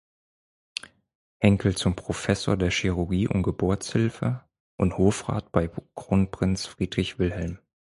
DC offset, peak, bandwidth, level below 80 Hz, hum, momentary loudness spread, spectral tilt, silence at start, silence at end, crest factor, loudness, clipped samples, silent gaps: under 0.1%; -4 dBFS; 11.5 kHz; -42 dBFS; none; 11 LU; -6 dB/octave; 0.85 s; 0.25 s; 22 dB; -26 LUFS; under 0.1%; 1.15-1.40 s, 4.60-4.78 s